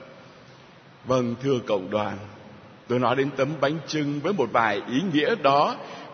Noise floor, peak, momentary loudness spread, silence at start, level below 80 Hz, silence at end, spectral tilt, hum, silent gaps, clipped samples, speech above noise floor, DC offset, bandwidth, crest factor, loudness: -50 dBFS; -4 dBFS; 9 LU; 0 s; -66 dBFS; 0 s; -6 dB/octave; none; none; under 0.1%; 26 dB; under 0.1%; 6.6 kHz; 20 dB; -24 LUFS